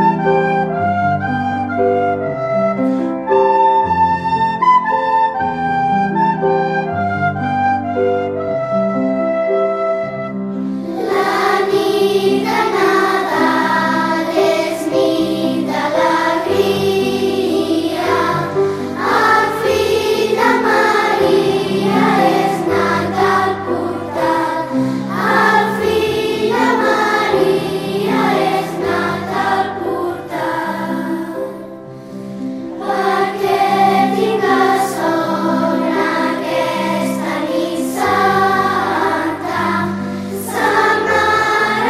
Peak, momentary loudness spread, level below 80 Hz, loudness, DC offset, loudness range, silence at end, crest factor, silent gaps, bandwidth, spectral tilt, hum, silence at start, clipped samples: 0 dBFS; 7 LU; -52 dBFS; -15 LUFS; under 0.1%; 4 LU; 0 s; 14 dB; none; 15.5 kHz; -5.5 dB/octave; none; 0 s; under 0.1%